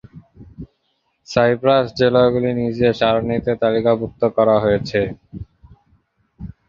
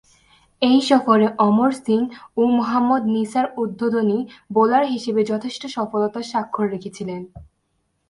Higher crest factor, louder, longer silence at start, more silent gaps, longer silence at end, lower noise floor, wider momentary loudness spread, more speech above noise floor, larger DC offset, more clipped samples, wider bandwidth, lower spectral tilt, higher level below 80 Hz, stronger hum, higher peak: about the same, 18 dB vs 18 dB; first, -17 LUFS vs -20 LUFS; second, 0.15 s vs 0.6 s; neither; second, 0.2 s vs 0.65 s; about the same, -68 dBFS vs -70 dBFS; first, 22 LU vs 11 LU; about the same, 51 dB vs 50 dB; neither; neither; second, 7.4 kHz vs 11.5 kHz; about the same, -7 dB/octave vs -6 dB/octave; first, -46 dBFS vs -58 dBFS; neither; about the same, -2 dBFS vs -2 dBFS